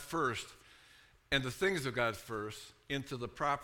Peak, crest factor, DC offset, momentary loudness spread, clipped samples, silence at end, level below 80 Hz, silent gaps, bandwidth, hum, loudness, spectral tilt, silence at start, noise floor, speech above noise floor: -16 dBFS; 22 dB; under 0.1%; 10 LU; under 0.1%; 0 s; -60 dBFS; none; 18 kHz; none; -36 LUFS; -4 dB/octave; 0 s; -63 dBFS; 27 dB